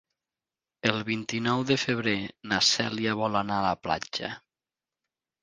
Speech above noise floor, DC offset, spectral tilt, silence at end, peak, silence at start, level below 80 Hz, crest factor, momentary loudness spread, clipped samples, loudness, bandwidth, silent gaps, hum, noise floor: over 62 dB; under 0.1%; -3.5 dB/octave; 1.05 s; -4 dBFS; 0.85 s; -60 dBFS; 26 dB; 9 LU; under 0.1%; -27 LUFS; 10 kHz; none; none; under -90 dBFS